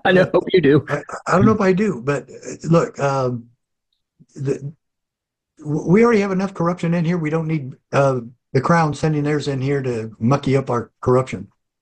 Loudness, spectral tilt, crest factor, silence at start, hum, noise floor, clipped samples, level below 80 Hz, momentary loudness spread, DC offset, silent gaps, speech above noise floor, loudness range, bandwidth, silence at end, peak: -19 LUFS; -7 dB/octave; 16 dB; 0.05 s; none; -82 dBFS; under 0.1%; -50 dBFS; 11 LU; under 0.1%; none; 64 dB; 5 LU; 9 kHz; 0.35 s; -4 dBFS